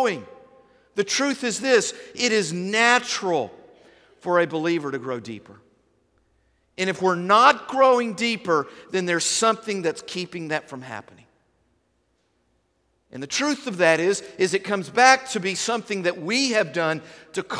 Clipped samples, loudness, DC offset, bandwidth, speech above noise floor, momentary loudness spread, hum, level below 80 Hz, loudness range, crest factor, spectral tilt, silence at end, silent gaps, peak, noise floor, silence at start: under 0.1%; -22 LUFS; under 0.1%; 11 kHz; 46 dB; 15 LU; none; -70 dBFS; 8 LU; 22 dB; -3 dB/octave; 0 s; none; -2 dBFS; -69 dBFS; 0 s